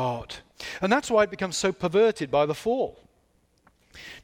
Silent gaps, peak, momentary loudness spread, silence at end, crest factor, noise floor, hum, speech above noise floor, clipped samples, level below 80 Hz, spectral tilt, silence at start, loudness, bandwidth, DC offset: none; -8 dBFS; 16 LU; 0.05 s; 18 dB; -66 dBFS; none; 42 dB; under 0.1%; -58 dBFS; -4.5 dB/octave; 0 s; -25 LUFS; 16 kHz; under 0.1%